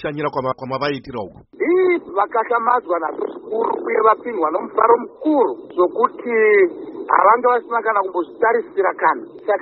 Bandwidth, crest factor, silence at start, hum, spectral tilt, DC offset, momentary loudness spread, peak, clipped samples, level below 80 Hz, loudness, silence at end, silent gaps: 5.8 kHz; 18 dB; 0 s; none; -4 dB/octave; under 0.1%; 10 LU; 0 dBFS; under 0.1%; -60 dBFS; -18 LUFS; 0 s; none